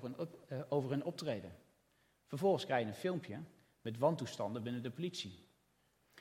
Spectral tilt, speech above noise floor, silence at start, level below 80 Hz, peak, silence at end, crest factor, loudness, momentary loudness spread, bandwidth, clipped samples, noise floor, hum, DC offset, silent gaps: -6 dB/octave; 37 dB; 0 s; -82 dBFS; -20 dBFS; 0 s; 20 dB; -40 LUFS; 14 LU; 16.5 kHz; under 0.1%; -76 dBFS; none; under 0.1%; none